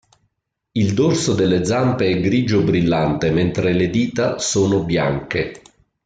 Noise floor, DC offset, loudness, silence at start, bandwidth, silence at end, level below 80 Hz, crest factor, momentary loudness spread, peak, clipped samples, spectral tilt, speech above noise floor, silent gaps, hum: -72 dBFS; under 0.1%; -18 LUFS; 0.75 s; 9.4 kHz; 0.45 s; -46 dBFS; 12 dB; 4 LU; -6 dBFS; under 0.1%; -5.5 dB/octave; 55 dB; none; none